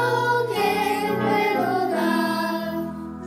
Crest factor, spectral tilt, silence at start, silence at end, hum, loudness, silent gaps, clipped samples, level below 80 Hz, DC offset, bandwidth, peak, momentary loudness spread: 14 dB; -5.5 dB/octave; 0 s; 0 s; none; -23 LUFS; none; under 0.1%; -62 dBFS; under 0.1%; 16 kHz; -10 dBFS; 7 LU